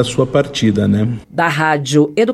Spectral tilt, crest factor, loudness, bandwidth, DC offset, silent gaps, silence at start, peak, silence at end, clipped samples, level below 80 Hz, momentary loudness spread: -5.5 dB/octave; 14 dB; -15 LUFS; 13.5 kHz; under 0.1%; none; 0 s; 0 dBFS; 0 s; under 0.1%; -44 dBFS; 4 LU